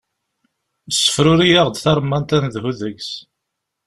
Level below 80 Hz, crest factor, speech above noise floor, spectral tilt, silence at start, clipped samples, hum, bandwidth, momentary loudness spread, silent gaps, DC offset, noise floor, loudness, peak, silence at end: -46 dBFS; 18 dB; 62 dB; -4.5 dB/octave; 0.9 s; under 0.1%; none; 13.5 kHz; 15 LU; none; under 0.1%; -78 dBFS; -16 LUFS; 0 dBFS; 0.65 s